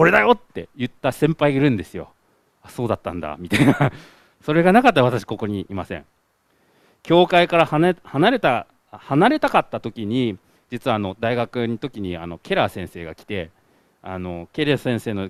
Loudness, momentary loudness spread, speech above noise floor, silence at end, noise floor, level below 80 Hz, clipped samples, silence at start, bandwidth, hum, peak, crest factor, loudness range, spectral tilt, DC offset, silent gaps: -20 LUFS; 17 LU; 44 dB; 0 s; -64 dBFS; -52 dBFS; under 0.1%; 0 s; 14.5 kHz; none; 0 dBFS; 20 dB; 7 LU; -6.5 dB/octave; under 0.1%; none